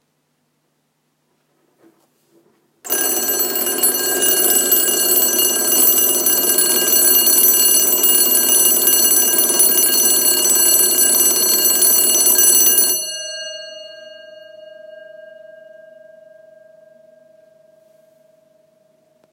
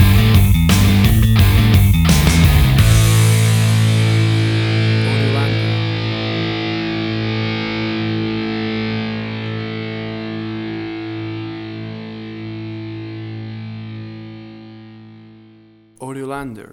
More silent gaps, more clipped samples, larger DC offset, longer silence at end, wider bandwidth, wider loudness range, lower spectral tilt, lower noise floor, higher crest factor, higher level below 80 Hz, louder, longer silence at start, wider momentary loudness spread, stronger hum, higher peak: neither; neither; neither; first, 4.1 s vs 0.1 s; second, 17 kHz vs over 20 kHz; second, 11 LU vs 18 LU; second, 1 dB/octave vs -5.5 dB/octave; first, -67 dBFS vs -47 dBFS; about the same, 16 dB vs 14 dB; second, -74 dBFS vs -24 dBFS; first, -11 LUFS vs -16 LUFS; first, 2.85 s vs 0 s; second, 7 LU vs 17 LU; neither; about the same, 0 dBFS vs 0 dBFS